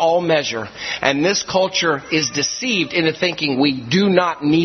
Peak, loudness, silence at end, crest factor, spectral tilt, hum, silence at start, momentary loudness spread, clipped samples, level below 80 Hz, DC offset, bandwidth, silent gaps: 0 dBFS; -18 LUFS; 0 s; 18 dB; -4 dB/octave; none; 0 s; 4 LU; under 0.1%; -56 dBFS; under 0.1%; 6.4 kHz; none